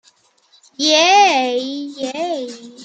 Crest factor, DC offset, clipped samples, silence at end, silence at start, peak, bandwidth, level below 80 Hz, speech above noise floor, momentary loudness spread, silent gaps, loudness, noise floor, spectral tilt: 16 dB; under 0.1%; under 0.1%; 0 s; 0.8 s; -2 dBFS; 9 kHz; -76 dBFS; 39 dB; 15 LU; none; -15 LUFS; -55 dBFS; -0.5 dB/octave